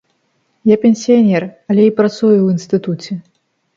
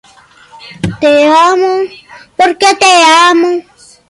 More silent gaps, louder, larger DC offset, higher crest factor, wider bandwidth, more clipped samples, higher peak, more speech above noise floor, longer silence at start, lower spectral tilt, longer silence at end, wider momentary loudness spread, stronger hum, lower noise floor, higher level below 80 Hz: neither; second, -13 LUFS vs -7 LUFS; neither; about the same, 14 dB vs 10 dB; second, 7.4 kHz vs 11.5 kHz; neither; about the same, 0 dBFS vs 0 dBFS; first, 50 dB vs 34 dB; about the same, 0.65 s vs 0.6 s; first, -7.5 dB/octave vs -3 dB/octave; about the same, 0.55 s vs 0.5 s; second, 11 LU vs 16 LU; neither; first, -63 dBFS vs -41 dBFS; second, -62 dBFS vs -46 dBFS